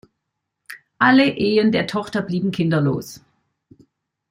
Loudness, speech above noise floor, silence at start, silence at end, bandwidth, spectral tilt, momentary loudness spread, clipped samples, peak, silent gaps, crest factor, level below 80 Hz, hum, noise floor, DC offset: -19 LUFS; 60 dB; 0.7 s; 1.15 s; 16 kHz; -6.5 dB/octave; 24 LU; under 0.1%; -2 dBFS; none; 18 dB; -60 dBFS; none; -78 dBFS; under 0.1%